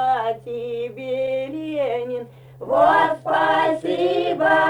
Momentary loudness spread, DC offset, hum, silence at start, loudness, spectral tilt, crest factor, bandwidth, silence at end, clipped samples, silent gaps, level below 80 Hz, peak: 12 LU; under 0.1%; none; 0 s; -21 LUFS; -6 dB/octave; 16 dB; 11 kHz; 0 s; under 0.1%; none; -60 dBFS; -4 dBFS